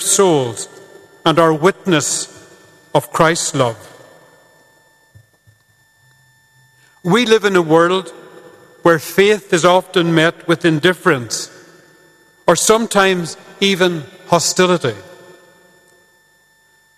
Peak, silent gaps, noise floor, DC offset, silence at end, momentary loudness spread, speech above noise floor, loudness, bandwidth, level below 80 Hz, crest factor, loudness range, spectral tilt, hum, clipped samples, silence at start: 0 dBFS; none; -55 dBFS; under 0.1%; 1.85 s; 11 LU; 41 dB; -14 LUFS; 14.5 kHz; -54 dBFS; 16 dB; 6 LU; -4 dB/octave; none; under 0.1%; 0 s